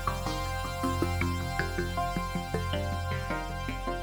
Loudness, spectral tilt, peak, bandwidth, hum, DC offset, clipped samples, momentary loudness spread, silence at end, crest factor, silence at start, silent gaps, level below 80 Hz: -32 LUFS; -5.5 dB/octave; -14 dBFS; over 20 kHz; none; under 0.1%; under 0.1%; 4 LU; 0 s; 18 dB; 0 s; none; -40 dBFS